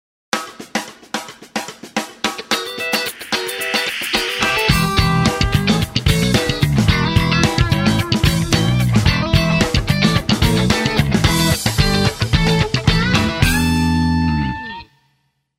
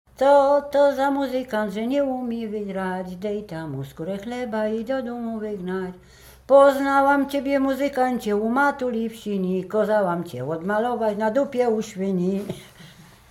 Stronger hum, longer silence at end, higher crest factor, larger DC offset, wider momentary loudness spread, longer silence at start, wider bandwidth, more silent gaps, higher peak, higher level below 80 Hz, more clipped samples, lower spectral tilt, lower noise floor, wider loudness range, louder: neither; first, 0.75 s vs 0.3 s; about the same, 16 dB vs 18 dB; neither; second, 10 LU vs 13 LU; first, 0.35 s vs 0.2 s; about the same, 16.5 kHz vs 15.5 kHz; neither; first, 0 dBFS vs -4 dBFS; first, -28 dBFS vs -56 dBFS; neither; second, -4.5 dB/octave vs -6.5 dB/octave; first, -65 dBFS vs -47 dBFS; second, 5 LU vs 8 LU; first, -16 LUFS vs -23 LUFS